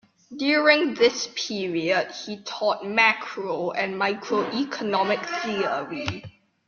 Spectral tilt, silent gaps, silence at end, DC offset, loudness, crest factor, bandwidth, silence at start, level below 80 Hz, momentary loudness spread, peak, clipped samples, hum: -3.5 dB/octave; none; 0.35 s; under 0.1%; -24 LUFS; 20 dB; 7.2 kHz; 0.3 s; -66 dBFS; 12 LU; -4 dBFS; under 0.1%; none